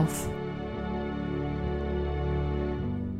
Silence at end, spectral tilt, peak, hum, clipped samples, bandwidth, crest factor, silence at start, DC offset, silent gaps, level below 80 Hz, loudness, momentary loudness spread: 0 s; -6.5 dB/octave; -14 dBFS; none; under 0.1%; 16 kHz; 16 dB; 0 s; 0.1%; none; -36 dBFS; -32 LUFS; 4 LU